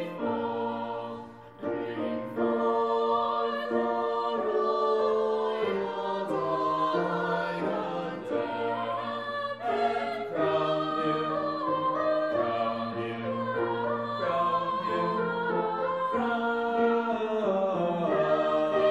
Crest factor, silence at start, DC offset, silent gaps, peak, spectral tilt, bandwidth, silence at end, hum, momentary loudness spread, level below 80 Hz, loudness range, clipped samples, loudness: 14 dB; 0 s; under 0.1%; none; -14 dBFS; -7 dB/octave; 8.4 kHz; 0 s; none; 6 LU; -70 dBFS; 3 LU; under 0.1%; -29 LUFS